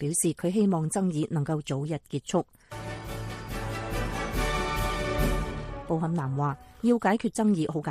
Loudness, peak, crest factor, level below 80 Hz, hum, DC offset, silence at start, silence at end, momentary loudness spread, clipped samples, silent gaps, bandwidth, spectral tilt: -29 LUFS; -12 dBFS; 16 dB; -38 dBFS; none; under 0.1%; 0 s; 0 s; 12 LU; under 0.1%; none; 15.5 kHz; -5.5 dB/octave